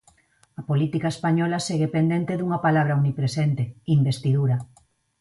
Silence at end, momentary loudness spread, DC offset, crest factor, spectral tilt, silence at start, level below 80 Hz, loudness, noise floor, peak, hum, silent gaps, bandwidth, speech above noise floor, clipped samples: 0.55 s; 5 LU; under 0.1%; 14 dB; -7 dB/octave; 0.6 s; -60 dBFS; -23 LUFS; -60 dBFS; -8 dBFS; none; none; 11.5 kHz; 38 dB; under 0.1%